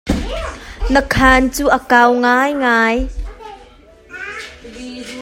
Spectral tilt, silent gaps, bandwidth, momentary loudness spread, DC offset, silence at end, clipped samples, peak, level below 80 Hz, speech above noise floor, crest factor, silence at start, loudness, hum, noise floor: -4.5 dB/octave; none; 16.5 kHz; 21 LU; under 0.1%; 0 s; under 0.1%; 0 dBFS; -28 dBFS; 30 dB; 16 dB; 0.05 s; -13 LUFS; none; -43 dBFS